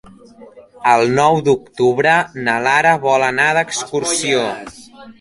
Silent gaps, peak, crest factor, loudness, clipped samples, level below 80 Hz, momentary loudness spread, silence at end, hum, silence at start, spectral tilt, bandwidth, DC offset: none; 0 dBFS; 16 dB; -15 LUFS; under 0.1%; -54 dBFS; 7 LU; 0.1 s; none; 0.4 s; -3.5 dB/octave; 11.5 kHz; under 0.1%